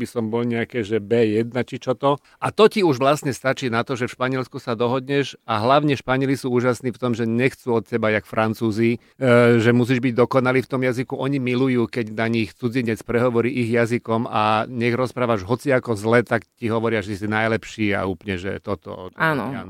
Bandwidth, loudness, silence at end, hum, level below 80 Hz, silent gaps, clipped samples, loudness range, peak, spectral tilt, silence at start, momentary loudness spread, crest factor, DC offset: 15.5 kHz; -21 LUFS; 0 s; none; -56 dBFS; none; under 0.1%; 3 LU; -2 dBFS; -6.5 dB/octave; 0 s; 7 LU; 18 dB; under 0.1%